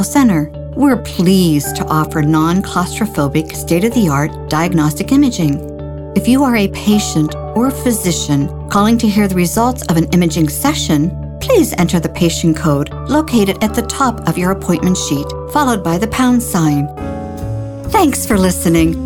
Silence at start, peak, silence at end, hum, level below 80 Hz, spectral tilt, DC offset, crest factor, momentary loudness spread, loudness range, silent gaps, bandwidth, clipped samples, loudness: 0 s; 0 dBFS; 0 s; none; -30 dBFS; -5.5 dB/octave; under 0.1%; 12 dB; 6 LU; 1 LU; none; 19 kHz; under 0.1%; -14 LUFS